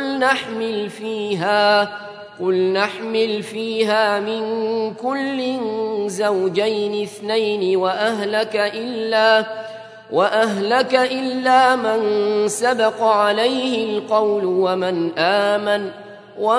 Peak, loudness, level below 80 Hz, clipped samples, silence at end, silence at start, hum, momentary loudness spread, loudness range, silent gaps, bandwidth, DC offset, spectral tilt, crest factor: -2 dBFS; -19 LUFS; -74 dBFS; under 0.1%; 0 s; 0 s; none; 9 LU; 4 LU; none; 11 kHz; under 0.1%; -4 dB/octave; 18 dB